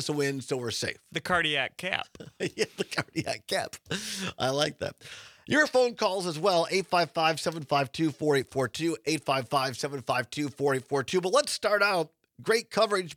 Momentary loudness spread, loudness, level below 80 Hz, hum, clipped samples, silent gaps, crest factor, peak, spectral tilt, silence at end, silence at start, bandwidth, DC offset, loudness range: 9 LU; -28 LUFS; -68 dBFS; none; under 0.1%; none; 20 dB; -8 dBFS; -4 dB/octave; 0 s; 0 s; 18.5 kHz; under 0.1%; 5 LU